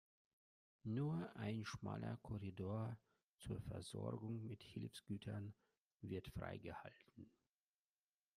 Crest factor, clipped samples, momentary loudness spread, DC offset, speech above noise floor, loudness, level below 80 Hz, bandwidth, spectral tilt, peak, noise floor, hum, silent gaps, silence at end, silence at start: 18 dB; under 0.1%; 14 LU; under 0.1%; over 41 dB; -50 LUFS; -72 dBFS; 14 kHz; -7 dB/octave; -34 dBFS; under -90 dBFS; none; 3.29-3.36 s, 5.78-5.84 s, 5.94-6.00 s; 1.1 s; 0.85 s